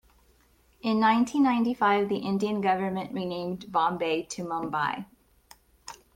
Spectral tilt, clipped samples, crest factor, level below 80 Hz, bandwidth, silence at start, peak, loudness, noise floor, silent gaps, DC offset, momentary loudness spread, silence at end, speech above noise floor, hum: -5.5 dB/octave; under 0.1%; 18 dB; -64 dBFS; 16 kHz; 0.85 s; -10 dBFS; -27 LUFS; -63 dBFS; none; under 0.1%; 12 LU; 0.2 s; 37 dB; none